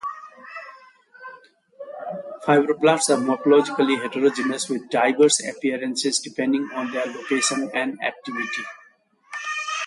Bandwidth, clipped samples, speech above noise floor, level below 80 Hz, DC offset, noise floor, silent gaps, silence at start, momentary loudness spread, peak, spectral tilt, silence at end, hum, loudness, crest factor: 11.5 kHz; under 0.1%; 35 dB; -74 dBFS; under 0.1%; -56 dBFS; none; 0.05 s; 20 LU; -4 dBFS; -3 dB/octave; 0 s; none; -22 LUFS; 20 dB